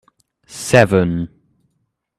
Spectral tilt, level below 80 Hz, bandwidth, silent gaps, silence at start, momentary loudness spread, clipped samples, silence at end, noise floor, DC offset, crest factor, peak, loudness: -5.5 dB/octave; -48 dBFS; 14.5 kHz; none; 0.5 s; 19 LU; under 0.1%; 0.9 s; -70 dBFS; under 0.1%; 18 dB; 0 dBFS; -15 LUFS